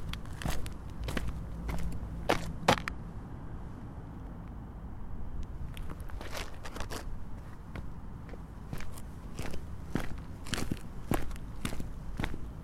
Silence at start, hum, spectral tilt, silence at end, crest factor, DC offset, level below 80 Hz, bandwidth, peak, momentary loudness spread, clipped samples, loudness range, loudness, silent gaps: 0 s; none; -5 dB/octave; 0 s; 28 dB; under 0.1%; -42 dBFS; 16 kHz; -8 dBFS; 13 LU; under 0.1%; 9 LU; -39 LUFS; none